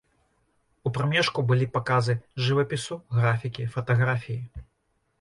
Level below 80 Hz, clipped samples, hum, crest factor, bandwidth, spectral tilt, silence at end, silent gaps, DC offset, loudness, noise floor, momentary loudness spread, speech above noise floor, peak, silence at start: -54 dBFS; under 0.1%; none; 16 dB; 11 kHz; -6 dB/octave; 0.6 s; none; under 0.1%; -26 LUFS; -73 dBFS; 9 LU; 48 dB; -10 dBFS; 0.85 s